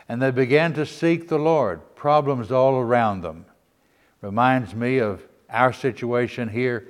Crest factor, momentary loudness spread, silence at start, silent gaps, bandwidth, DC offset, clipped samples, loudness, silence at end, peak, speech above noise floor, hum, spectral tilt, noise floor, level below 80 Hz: 20 dB; 9 LU; 0.1 s; none; 12.5 kHz; under 0.1%; under 0.1%; -22 LUFS; 0.05 s; -2 dBFS; 41 dB; none; -7.5 dB/octave; -62 dBFS; -60 dBFS